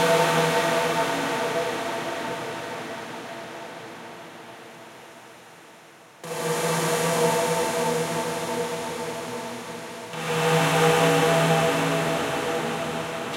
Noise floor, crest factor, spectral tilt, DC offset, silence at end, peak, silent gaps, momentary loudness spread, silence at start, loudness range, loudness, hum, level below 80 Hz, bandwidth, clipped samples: -49 dBFS; 18 dB; -4 dB/octave; under 0.1%; 0 s; -8 dBFS; none; 20 LU; 0 s; 15 LU; -24 LUFS; none; -64 dBFS; 16 kHz; under 0.1%